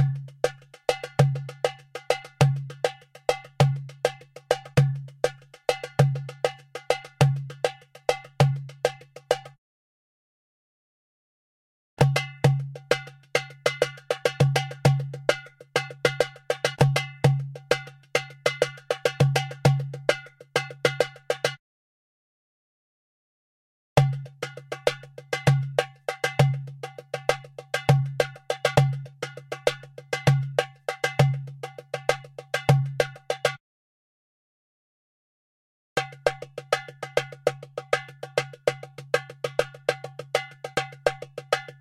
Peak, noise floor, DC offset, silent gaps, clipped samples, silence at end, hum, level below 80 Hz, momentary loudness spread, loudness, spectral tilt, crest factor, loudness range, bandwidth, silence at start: -2 dBFS; under -90 dBFS; under 0.1%; 9.58-11.97 s, 21.59-23.96 s, 33.60-35.96 s; under 0.1%; 0.1 s; none; -58 dBFS; 9 LU; -26 LUFS; -5.5 dB/octave; 24 dB; 6 LU; 14 kHz; 0 s